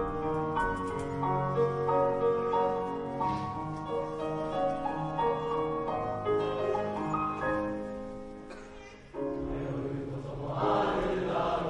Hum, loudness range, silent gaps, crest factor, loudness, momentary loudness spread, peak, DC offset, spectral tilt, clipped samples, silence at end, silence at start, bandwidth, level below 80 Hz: none; 5 LU; none; 16 dB; -32 LUFS; 10 LU; -16 dBFS; under 0.1%; -7.5 dB/octave; under 0.1%; 0 s; 0 s; 11 kHz; -50 dBFS